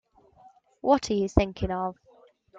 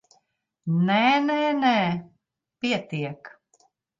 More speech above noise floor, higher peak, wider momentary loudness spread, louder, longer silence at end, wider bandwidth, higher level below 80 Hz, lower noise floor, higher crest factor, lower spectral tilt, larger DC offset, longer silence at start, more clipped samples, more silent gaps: second, 33 dB vs 49 dB; first, -4 dBFS vs -8 dBFS; second, 8 LU vs 14 LU; second, -27 LUFS vs -23 LUFS; second, 0 s vs 0.7 s; first, 9.2 kHz vs 7.6 kHz; first, -42 dBFS vs -70 dBFS; second, -58 dBFS vs -72 dBFS; first, 24 dB vs 16 dB; about the same, -6.5 dB/octave vs -6.5 dB/octave; neither; first, 0.85 s vs 0.65 s; neither; neither